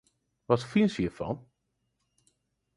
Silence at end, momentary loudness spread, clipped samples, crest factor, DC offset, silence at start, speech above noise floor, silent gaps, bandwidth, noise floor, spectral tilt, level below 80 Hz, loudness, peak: 1.35 s; 11 LU; under 0.1%; 24 dB; under 0.1%; 0.5 s; 51 dB; none; 11 kHz; -79 dBFS; -7 dB/octave; -58 dBFS; -29 LUFS; -8 dBFS